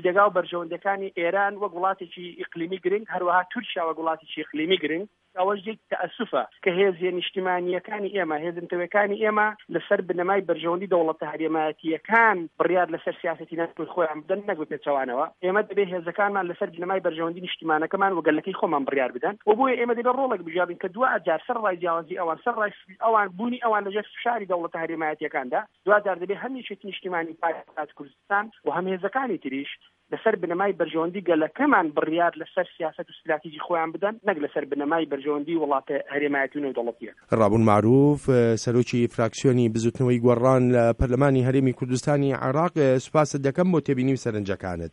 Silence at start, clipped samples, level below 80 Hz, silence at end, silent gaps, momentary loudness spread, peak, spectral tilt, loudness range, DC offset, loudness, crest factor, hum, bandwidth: 0 s; under 0.1%; -52 dBFS; 0.05 s; none; 10 LU; -4 dBFS; -6.5 dB/octave; 6 LU; under 0.1%; -25 LUFS; 20 dB; none; 11 kHz